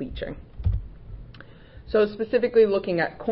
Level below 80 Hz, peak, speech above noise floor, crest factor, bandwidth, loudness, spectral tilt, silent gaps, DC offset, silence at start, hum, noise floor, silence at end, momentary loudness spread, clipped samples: -38 dBFS; -8 dBFS; 22 dB; 16 dB; 5.6 kHz; -24 LUFS; -11 dB/octave; none; under 0.1%; 0 s; none; -46 dBFS; 0 s; 24 LU; under 0.1%